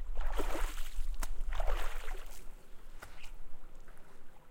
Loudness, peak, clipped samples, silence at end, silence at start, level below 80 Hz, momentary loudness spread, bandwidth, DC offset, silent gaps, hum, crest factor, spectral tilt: -43 LUFS; -18 dBFS; under 0.1%; 0 s; 0 s; -36 dBFS; 19 LU; 16 kHz; under 0.1%; none; none; 14 dB; -4 dB/octave